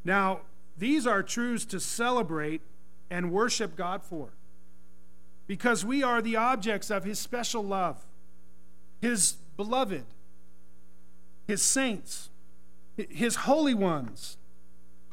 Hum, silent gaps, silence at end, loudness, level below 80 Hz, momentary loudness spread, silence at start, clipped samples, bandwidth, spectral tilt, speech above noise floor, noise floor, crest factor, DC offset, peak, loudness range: none; none; 0.8 s; -29 LUFS; -64 dBFS; 16 LU; 0.05 s; under 0.1%; 16 kHz; -3 dB/octave; 33 dB; -62 dBFS; 22 dB; 1%; -10 dBFS; 3 LU